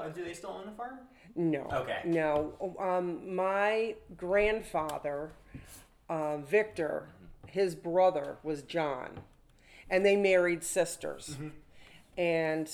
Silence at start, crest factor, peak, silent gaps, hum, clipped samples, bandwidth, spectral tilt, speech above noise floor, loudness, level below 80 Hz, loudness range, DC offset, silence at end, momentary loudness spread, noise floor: 0 s; 18 dB; -14 dBFS; none; none; under 0.1%; 18.5 kHz; -5 dB/octave; 26 dB; -32 LUFS; -58 dBFS; 4 LU; under 0.1%; 0 s; 16 LU; -58 dBFS